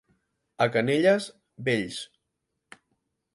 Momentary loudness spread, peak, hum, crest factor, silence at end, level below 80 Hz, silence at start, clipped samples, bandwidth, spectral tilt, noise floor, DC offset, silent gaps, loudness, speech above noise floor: 17 LU; -8 dBFS; none; 22 dB; 1.3 s; -68 dBFS; 0.6 s; under 0.1%; 11.5 kHz; -5.5 dB/octave; -81 dBFS; under 0.1%; none; -25 LUFS; 56 dB